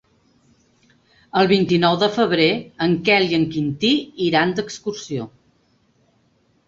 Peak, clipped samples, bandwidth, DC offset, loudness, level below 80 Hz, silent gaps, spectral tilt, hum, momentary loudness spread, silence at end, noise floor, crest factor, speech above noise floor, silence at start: -2 dBFS; under 0.1%; 7.8 kHz; under 0.1%; -19 LUFS; -58 dBFS; none; -5.5 dB/octave; none; 12 LU; 1.4 s; -62 dBFS; 18 dB; 43 dB; 1.35 s